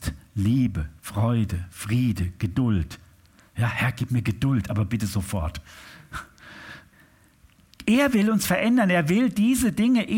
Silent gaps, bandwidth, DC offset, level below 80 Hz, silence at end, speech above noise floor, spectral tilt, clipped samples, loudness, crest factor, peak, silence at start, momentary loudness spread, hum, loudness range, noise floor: none; 17 kHz; under 0.1%; -42 dBFS; 0 s; 34 dB; -6 dB/octave; under 0.1%; -24 LUFS; 14 dB; -10 dBFS; 0 s; 19 LU; none; 7 LU; -57 dBFS